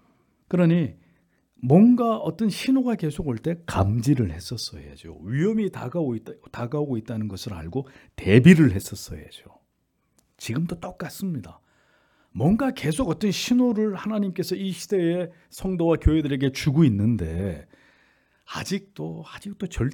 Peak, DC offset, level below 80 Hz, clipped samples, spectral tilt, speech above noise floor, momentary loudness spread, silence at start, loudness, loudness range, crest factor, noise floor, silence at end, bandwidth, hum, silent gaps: -2 dBFS; under 0.1%; -42 dBFS; under 0.1%; -7 dB/octave; 49 dB; 17 LU; 0.5 s; -23 LUFS; 7 LU; 22 dB; -72 dBFS; 0 s; 18 kHz; none; none